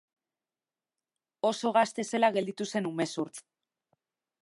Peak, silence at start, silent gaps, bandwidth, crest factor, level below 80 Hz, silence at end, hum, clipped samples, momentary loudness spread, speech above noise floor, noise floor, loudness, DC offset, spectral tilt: -12 dBFS; 1.45 s; none; 11.5 kHz; 22 dB; -84 dBFS; 1 s; none; under 0.1%; 9 LU; over 61 dB; under -90 dBFS; -30 LUFS; under 0.1%; -4.5 dB/octave